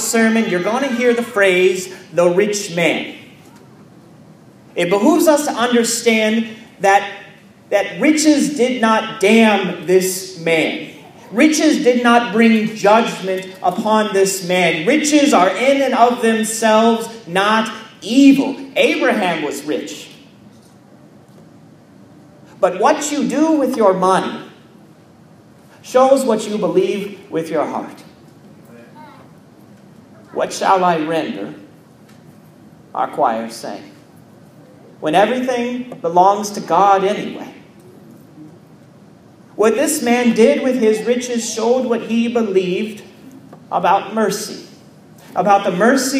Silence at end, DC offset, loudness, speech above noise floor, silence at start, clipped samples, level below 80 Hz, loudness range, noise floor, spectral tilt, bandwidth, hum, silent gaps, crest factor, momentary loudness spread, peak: 0 s; under 0.1%; -15 LUFS; 30 dB; 0 s; under 0.1%; -68 dBFS; 8 LU; -45 dBFS; -4 dB/octave; 15.5 kHz; none; none; 16 dB; 12 LU; 0 dBFS